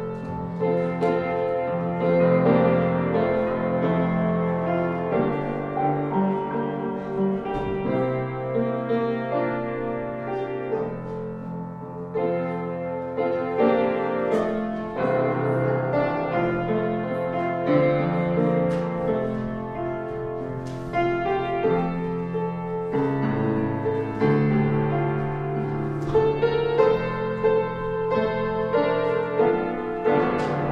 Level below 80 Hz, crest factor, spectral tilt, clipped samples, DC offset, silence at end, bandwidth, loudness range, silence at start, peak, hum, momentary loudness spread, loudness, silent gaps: -48 dBFS; 18 dB; -9 dB/octave; under 0.1%; under 0.1%; 0 s; 7 kHz; 5 LU; 0 s; -6 dBFS; none; 8 LU; -24 LUFS; none